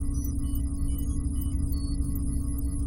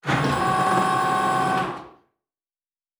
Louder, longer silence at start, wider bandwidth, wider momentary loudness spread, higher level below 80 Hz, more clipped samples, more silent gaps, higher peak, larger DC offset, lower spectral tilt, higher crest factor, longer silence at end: second, -31 LUFS vs -22 LUFS; about the same, 0 s vs 0.05 s; second, 16.5 kHz vs over 20 kHz; second, 1 LU vs 7 LU; first, -28 dBFS vs -52 dBFS; neither; neither; second, -16 dBFS vs -10 dBFS; neither; first, -7 dB/octave vs -5 dB/octave; about the same, 12 dB vs 14 dB; second, 0 s vs 1.1 s